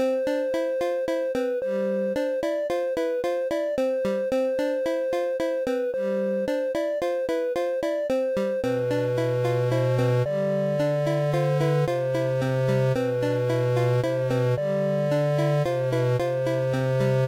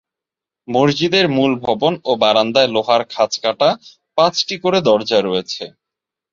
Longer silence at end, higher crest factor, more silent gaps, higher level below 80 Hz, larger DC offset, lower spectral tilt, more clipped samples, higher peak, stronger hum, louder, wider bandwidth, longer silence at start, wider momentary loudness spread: second, 0 s vs 0.65 s; second, 10 dB vs 16 dB; neither; about the same, -58 dBFS vs -58 dBFS; neither; first, -7.5 dB/octave vs -4.5 dB/octave; neither; second, -14 dBFS vs -2 dBFS; neither; second, -25 LUFS vs -16 LUFS; first, 16 kHz vs 7.6 kHz; second, 0 s vs 0.7 s; second, 3 LU vs 8 LU